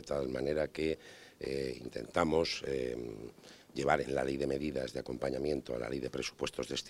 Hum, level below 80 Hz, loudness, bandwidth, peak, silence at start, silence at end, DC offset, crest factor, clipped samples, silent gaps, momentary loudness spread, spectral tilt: none; -56 dBFS; -36 LUFS; 16 kHz; -12 dBFS; 0 s; 0 s; under 0.1%; 24 dB; under 0.1%; none; 12 LU; -5 dB/octave